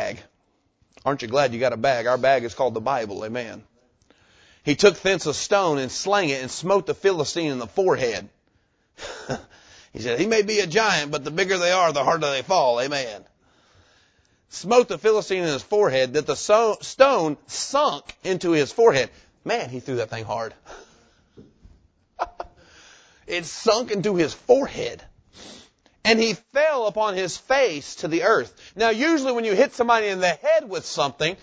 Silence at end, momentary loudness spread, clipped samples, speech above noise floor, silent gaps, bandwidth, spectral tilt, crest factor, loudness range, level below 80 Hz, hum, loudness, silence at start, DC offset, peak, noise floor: 0.05 s; 13 LU; under 0.1%; 46 dB; none; 8 kHz; -3.5 dB/octave; 22 dB; 6 LU; -58 dBFS; none; -22 LUFS; 0 s; under 0.1%; -2 dBFS; -67 dBFS